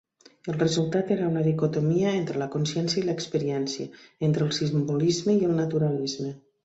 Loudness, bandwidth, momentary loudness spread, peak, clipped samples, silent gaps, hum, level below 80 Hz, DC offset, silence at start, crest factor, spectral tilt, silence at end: -26 LUFS; 8 kHz; 8 LU; -10 dBFS; under 0.1%; none; none; -64 dBFS; under 0.1%; 0.45 s; 16 dB; -6 dB/octave; 0.25 s